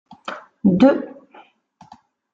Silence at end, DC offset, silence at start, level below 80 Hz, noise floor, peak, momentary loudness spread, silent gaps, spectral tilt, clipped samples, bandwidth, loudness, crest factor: 1.2 s; under 0.1%; 0.25 s; -56 dBFS; -52 dBFS; -2 dBFS; 19 LU; none; -8.5 dB/octave; under 0.1%; 7.6 kHz; -17 LUFS; 18 dB